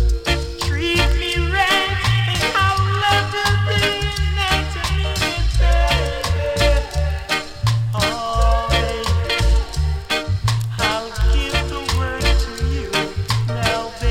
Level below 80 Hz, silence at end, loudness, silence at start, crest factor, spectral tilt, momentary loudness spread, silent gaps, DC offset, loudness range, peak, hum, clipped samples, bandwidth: -22 dBFS; 0 s; -19 LUFS; 0 s; 14 dB; -4.5 dB/octave; 5 LU; none; under 0.1%; 3 LU; -4 dBFS; none; under 0.1%; 16 kHz